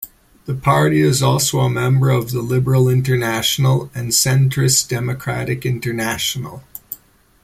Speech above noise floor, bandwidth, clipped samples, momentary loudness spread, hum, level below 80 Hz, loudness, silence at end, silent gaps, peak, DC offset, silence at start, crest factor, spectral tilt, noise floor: 30 dB; 16 kHz; under 0.1%; 17 LU; none; -46 dBFS; -16 LUFS; 0.5 s; none; -2 dBFS; under 0.1%; 0 s; 16 dB; -4.5 dB/octave; -47 dBFS